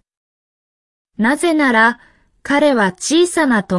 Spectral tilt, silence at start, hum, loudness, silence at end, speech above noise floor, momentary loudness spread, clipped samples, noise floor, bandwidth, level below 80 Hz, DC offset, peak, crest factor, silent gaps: -4 dB/octave; 1.2 s; none; -14 LUFS; 0 s; over 76 dB; 7 LU; under 0.1%; under -90 dBFS; 12 kHz; -54 dBFS; under 0.1%; -2 dBFS; 14 dB; none